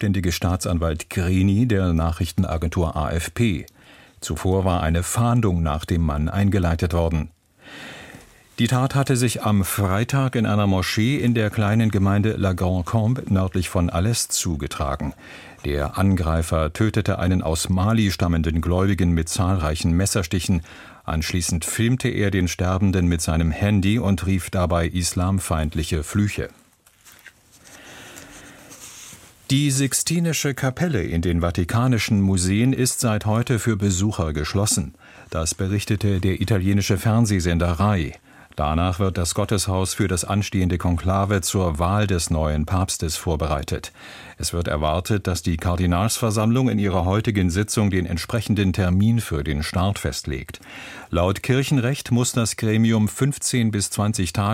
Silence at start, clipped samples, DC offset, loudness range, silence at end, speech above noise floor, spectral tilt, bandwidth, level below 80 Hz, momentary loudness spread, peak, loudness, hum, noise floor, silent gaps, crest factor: 0 s; under 0.1%; under 0.1%; 3 LU; 0 s; 32 dB; -5.5 dB/octave; 16.5 kHz; -34 dBFS; 8 LU; -4 dBFS; -21 LUFS; none; -53 dBFS; none; 16 dB